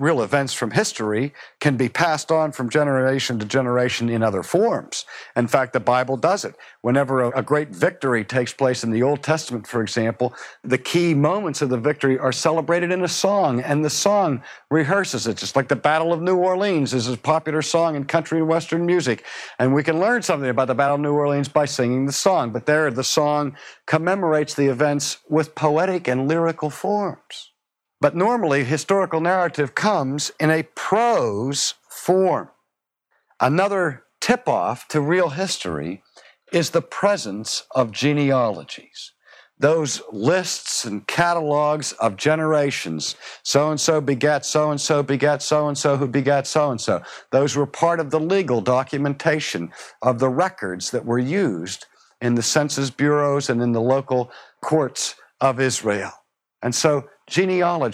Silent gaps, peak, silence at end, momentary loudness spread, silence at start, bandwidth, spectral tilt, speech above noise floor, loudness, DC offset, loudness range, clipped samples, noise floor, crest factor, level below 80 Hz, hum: none; -2 dBFS; 0 s; 7 LU; 0 s; 15.5 kHz; -4.5 dB/octave; 59 dB; -21 LUFS; under 0.1%; 2 LU; under 0.1%; -79 dBFS; 18 dB; -66 dBFS; none